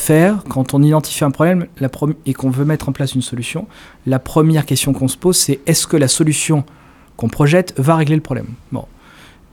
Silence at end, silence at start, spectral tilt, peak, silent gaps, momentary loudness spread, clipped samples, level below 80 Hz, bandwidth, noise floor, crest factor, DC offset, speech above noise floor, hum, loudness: 0.65 s; 0 s; -5 dB/octave; 0 dBFS; none; 11 LU; under 0.1%; -42 dBFS; 18.5 kHz; -43 dBFS; 16 dB; under 0.1%; 28 dB; none; -15 LUFS